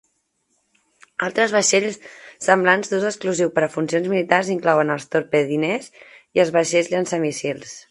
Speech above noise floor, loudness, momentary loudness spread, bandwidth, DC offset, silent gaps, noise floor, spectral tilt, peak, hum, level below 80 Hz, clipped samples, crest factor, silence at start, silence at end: 49 dB; -20 LUFS; 10 LU; 11.5 kHz; under 0.1%; none; -69 dBFS; -4 dB/octave; 0 dBFS; none; -68 dBFS; under 0.1%; 20 dB; 1.2 s; 0.1 s